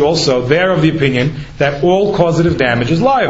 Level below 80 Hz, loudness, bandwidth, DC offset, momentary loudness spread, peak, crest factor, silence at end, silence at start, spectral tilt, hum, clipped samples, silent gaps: -36 dBFS; -13 LUFS; 8 kHz; under 0.1%; 5 LU; 0 dBFS; 12 dB; 0 s; 0 s; -6 dB/octave; none; under 0.1%; none